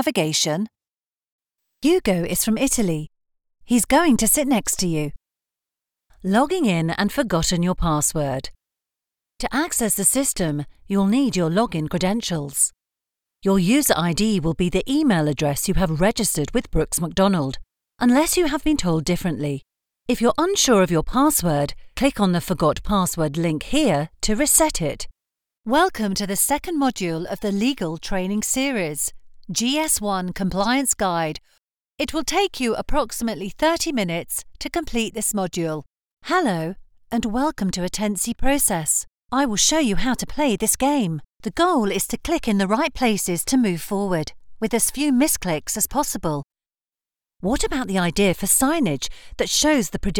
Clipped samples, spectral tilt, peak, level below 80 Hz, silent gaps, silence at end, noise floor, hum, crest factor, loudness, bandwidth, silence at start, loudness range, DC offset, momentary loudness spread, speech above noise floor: under 0.1%; -4 dB/octave; -4 dBFS; -38 dBFS; 1.32-1.39 s, 31.81-31.85 s, 36.13-36.17 s; 0 s; under -90 dBFS; none; 18 dB; -21 LUFS; over 20 kHz; 0 s; 3 LU; under 0.1%; 10 LU; over 69 dB